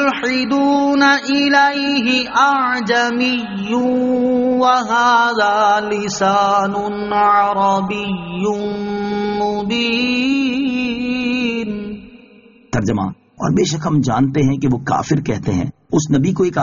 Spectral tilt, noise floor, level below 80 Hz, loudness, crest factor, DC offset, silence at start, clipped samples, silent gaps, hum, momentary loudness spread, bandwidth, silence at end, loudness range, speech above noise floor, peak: -4 dB/octave; -45 dBFS; -46 dBFS; -16 LUFS; 14 dB; under 0.1%; 0 s; under 0.1%; none; none; 8 LU; 7.4 kHz; 0 s; 5 LU; 30 dB; -2 dBFS